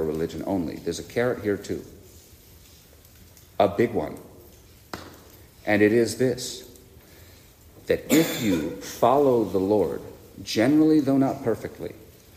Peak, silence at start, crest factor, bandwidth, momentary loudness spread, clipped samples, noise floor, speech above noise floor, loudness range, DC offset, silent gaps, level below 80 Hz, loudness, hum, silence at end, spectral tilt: -6 dBFS; 0 s; 18 dB; 15.5 kHz; 20 LU; under 0.1%; -51 dBFS; 28 dB; 8 LU; under 0.1%; none; -56 dBFS; -24 LUFS; none; 0.3 s; -5.5 dB/octave